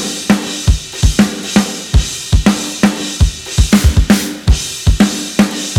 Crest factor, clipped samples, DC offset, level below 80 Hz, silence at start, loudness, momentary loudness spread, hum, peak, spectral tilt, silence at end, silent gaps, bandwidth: 12 dB; under 0.1%; under 0.1%; -18 dBFS; 0 s; -14 LUFS; 5 LU; none; 0 dBFS; -4.5 dB/octave; 0 s; none; 17.5 kHz